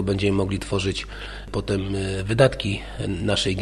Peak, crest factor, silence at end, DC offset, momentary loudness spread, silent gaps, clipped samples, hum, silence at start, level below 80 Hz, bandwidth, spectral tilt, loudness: -4 dBFS; 20 dB; 0 s; under 0.1%; 11 LU; none; under 0.1%; none; 0 s; -38 dBFS; 11.5 kHz; -5.5 dB/octave; -24 LUFS